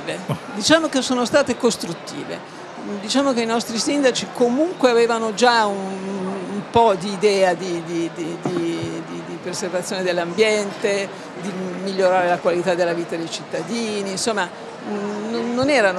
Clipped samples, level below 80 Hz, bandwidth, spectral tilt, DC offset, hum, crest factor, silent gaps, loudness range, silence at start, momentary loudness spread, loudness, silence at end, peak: under 0.1%; -60 dBFS; 13 kHz; -4 dB/octave; under 0.1%; none; 20 dB; none; 4 LU; 0 s; 13 LU; -21 LUFS; 0 s; 0 dBFS